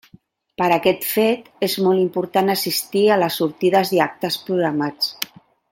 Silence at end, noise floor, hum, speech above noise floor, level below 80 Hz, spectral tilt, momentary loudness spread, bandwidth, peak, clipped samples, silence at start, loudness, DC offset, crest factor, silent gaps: 0.45 s; -52 dBFS; none; 34 dB; -64 dBFS; -4.5 dB/octave; 6 LU; 17 kHz; 0 dBFS; under 0.1%; 0.6 s; -19 LUFS; under 0.1%; 20 dB; none